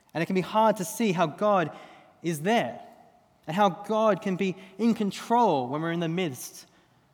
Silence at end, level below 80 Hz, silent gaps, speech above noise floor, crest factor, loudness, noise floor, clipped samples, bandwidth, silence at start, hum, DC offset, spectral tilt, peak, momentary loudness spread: 0.5 s; -78 dBFS; none; 32 dB; 18 dB; -26 LUFS; -58 dBFS; under 0.1%; over 20 kHz; 0.15 s; none; under 0.1%; -5.5 dB/octave; -8 dBFS; 11 LU